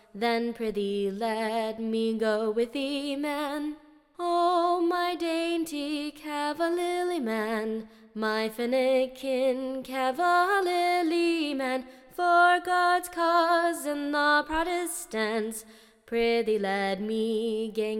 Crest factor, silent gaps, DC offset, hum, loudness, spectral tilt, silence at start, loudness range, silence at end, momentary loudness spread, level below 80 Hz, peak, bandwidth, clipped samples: 16 dB; none; under 0.1%; none; -27 LUFS; -4 dB/octave; 0.15 s; 5 LU; 0 s; 9 LU; -58 dBFS; -10 dBFS; 17 kHz; under 0.1%